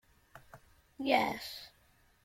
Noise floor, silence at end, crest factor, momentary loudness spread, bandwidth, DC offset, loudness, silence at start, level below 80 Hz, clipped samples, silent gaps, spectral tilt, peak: -68 dBFS; 0.55 s; 26 dB; 26 LU; 16.5 kHz; under 0.1%; -33 LUFS; 0.35 s; -68 dBFS; under 0.1%; none; -4 dB/octave; -12 dBFS